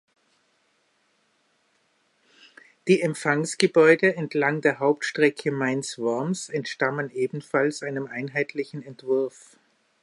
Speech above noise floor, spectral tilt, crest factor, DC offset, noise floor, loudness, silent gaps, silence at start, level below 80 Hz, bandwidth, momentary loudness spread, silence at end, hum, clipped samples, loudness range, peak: 44 dB; -5 dB/octave; 22 dB; under 0.1%; -68 dBFS; -24 LUFS; none; 2.85 s; -76 dBFS; 11.5 kHz; 12 LU; 0.75 s; none; under 0.1%; 7 LU; -4 dBFS